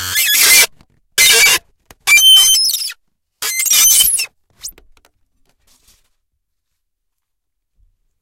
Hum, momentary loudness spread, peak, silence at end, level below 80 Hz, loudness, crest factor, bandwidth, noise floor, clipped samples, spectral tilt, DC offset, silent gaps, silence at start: none; 19 LU; 0 dBFS; 3.5 s; -50 dBFS; -8 LUFS; 16 dB; over 20 kHz; -76 dBFS; under 0.1%; 3 dB/octave; under 0.1%; none; 0 s